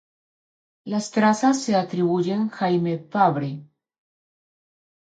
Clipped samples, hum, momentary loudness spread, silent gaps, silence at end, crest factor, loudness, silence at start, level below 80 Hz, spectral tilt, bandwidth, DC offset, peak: under 0.1%; none; 10 LU; none; 1.55 s; 18 dB; -22 LUFS; 0.85 s; -72 dBFS; -6 dB/octave; 9.2 kHz; under 0.1%; -6 dBFS